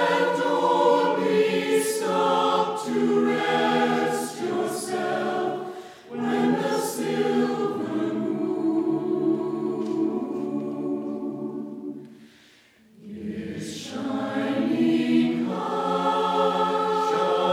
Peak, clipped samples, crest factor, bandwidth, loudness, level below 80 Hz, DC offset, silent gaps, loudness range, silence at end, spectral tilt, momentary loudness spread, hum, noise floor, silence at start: -8 dBFS; under 0.1%; 16 dB; 16.5 kHz; -24 LUFS; -74 dBFS; under 0.1%; none; 10 LU; 0 s; -5 dB/octave; 12 LU; none; -56 dBFS; 0 s